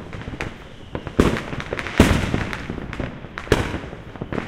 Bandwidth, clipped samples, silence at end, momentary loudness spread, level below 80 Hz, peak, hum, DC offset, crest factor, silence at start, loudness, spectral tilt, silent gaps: 16.5 kHz; under 0.1%; 0 s; 17 LU; -32 dBFS; 0 dBFS; none; under 0.1%; 24 dB; 0 s; -23 LUFS; -6 dB/octave; none